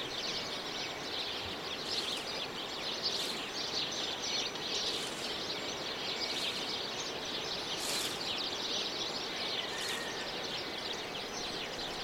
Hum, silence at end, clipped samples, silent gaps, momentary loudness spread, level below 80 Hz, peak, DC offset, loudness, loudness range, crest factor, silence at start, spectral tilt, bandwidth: none; 0 s; under 0.1%; none; 4 LU; -66 dBFS; -22 dBFS; under 0.1%; -35 LUFS; 1 LU; 16 dB; 0 s; -1.5 dB/octave; 16 kHz